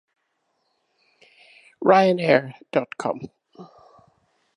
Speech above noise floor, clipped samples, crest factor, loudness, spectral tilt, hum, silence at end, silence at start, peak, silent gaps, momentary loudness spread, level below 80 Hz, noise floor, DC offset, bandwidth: 53 dB; under 0.1%; 24 dB; -21 LUFS; -6.5 dB/octave; none; 0.9 s; 1.8 s; -2 dBFS; none; 14 LU; -72 dBFS; -73 dBFS; under 0.1%; 10.5 kHz